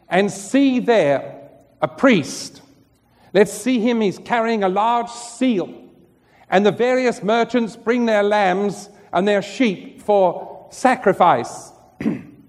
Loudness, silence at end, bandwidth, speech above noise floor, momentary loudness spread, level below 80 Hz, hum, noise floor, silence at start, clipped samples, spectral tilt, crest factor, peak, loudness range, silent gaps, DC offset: -18 LUFS; 0.2 s; 13.5 kHz; 37 dB; 13 LU; -62 dBFS; none; -55 dBFS; 0.1 s; under 0.1%; -5 dB/octave; 18 dB; 0 dBFS; 2 LU; none; under 0.1%